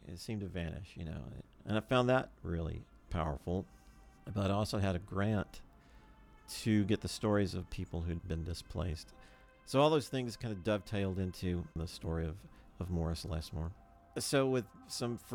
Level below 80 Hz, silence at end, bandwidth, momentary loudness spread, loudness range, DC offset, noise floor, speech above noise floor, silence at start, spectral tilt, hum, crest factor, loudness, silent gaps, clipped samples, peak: -54 dBFS; 0 s; 18.5 kHz; 14 LU; 3 LU; under 0.1%; -60 dBFS; 24 dB; 0 s; -6 dB/octave; none; 20 dB; -37 LUFS; none; under 0.1%; -16 dBFS